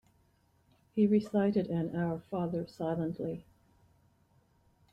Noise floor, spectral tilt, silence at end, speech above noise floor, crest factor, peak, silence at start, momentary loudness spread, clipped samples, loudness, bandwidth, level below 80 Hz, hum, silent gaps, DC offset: -70 dBFS; -9 dB/octave; 1.5 s; 38 dB; 18 dB; -16 dBFS; 0.95 s; 11 LU; under 0.1%; -33 LUFS; 7.6 kHz; -68 dBFS; none; none; under 0.1%